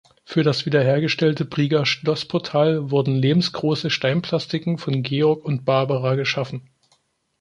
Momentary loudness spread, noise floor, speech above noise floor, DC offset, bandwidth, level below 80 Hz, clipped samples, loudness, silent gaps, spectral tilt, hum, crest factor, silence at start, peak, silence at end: 5 LU; -65 dBFS; 44 dB; under 0.1%; 10.5 kHz; -60 dBFS; under 0.1%; -21 LUFS; none; -6.5 dB/octave; none; 16 dB; 0.3 s; -4 dBFS; 0.8 s